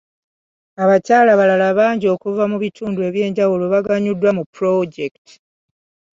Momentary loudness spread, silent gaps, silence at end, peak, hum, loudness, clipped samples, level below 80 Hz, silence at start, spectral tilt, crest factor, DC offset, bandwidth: 10 LU; 4.46-4.53 s; 1.05 s; -2 dBFS; none; -16 LUFS; under 0.1%; -62 dBFS; 0.8 s; -7 dB/octave; 16 dB; under 0.1%; 7.6 kHz